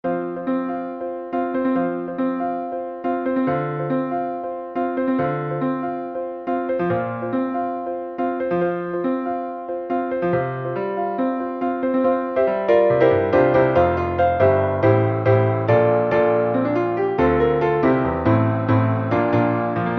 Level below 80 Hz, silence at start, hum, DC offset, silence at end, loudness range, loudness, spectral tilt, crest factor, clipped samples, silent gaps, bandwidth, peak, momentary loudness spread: -46 dBFS; 0.05 s; none; under 0.1%; 0 s; 7 LU; -21 LUFS; -10 dB/octave; 16 dB; under 0.1%; none; 5.8 kHz; -4 dBFS; 10 LU